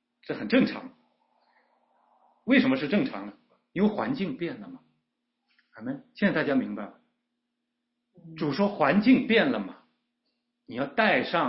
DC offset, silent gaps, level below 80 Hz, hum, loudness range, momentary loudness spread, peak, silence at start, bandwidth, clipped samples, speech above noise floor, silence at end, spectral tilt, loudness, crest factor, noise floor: under 0.1%; none; -68 dBFS; none; 6 LU; 18 LU; -8 dBFS; 0.3 s; 5.8 kHz; under 0.1%; 56 dB; 0 s; -10 dB/octave; -26 LUFS; 20 dB; -82 dBFS